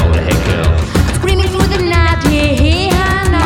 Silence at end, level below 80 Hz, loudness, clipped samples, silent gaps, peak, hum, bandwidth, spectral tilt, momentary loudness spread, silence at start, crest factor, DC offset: 0 s; -16 dBFS; -12 LUFS; under 0.1%; none; 0 dBFS; none; 16.5 kHz; -5.5 dB/octave; 2 LU; 0 s; 12 dB; under 0.1%